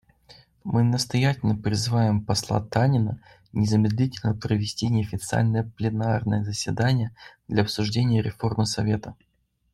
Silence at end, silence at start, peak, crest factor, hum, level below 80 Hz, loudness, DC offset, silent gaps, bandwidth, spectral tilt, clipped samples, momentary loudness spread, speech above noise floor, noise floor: 0.6 s; 0.65 s; -6 dBFS; 18 dB; none; -52 dBFS; -24 LUFS; under 0.1%; none; 13 kHz; -6 dB/octave; under 0.1%; 6 LU; 30 dB; -54 dBFS